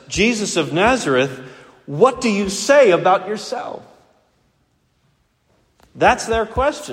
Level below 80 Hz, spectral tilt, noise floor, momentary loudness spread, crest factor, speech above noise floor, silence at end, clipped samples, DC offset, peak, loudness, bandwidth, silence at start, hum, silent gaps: -42 dBFS; -4 dB/octave; -63 dBFS; 15 LU; 18 dB; 46 dB; 0 s; under 0.1%; under 0.1%; 0 dBFS; -17 LUFS; 15.5 kHz; 0.1 s; none; none